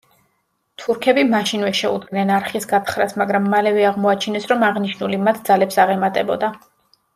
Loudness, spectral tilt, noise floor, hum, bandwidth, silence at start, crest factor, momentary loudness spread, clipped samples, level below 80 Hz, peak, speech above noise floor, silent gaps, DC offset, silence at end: -18 LUFS; -5 dB/octave; -68 dBFS; none; 15.5 kHz; 0.8 s; 16 dB; 6 LU; under 0.1%; -64 dBFS; -2 dBFS; 51 dB; none; under 0.1%; 0.6 s